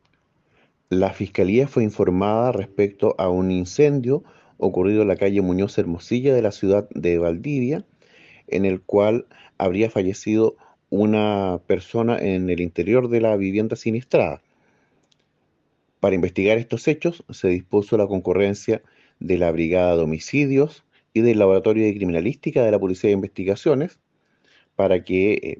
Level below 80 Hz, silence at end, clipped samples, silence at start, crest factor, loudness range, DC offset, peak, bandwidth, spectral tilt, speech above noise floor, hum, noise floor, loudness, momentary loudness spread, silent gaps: -58 dBFS; 0.05 s; under 0.1%; 0.9 s; 18 dB; 3 LU; under 0.1%; -4 dBFS; 7.6 kHz; -7.5 dB/octave; 48 dB; none; -68 dBFS; -21 LUFS; 6 LU; none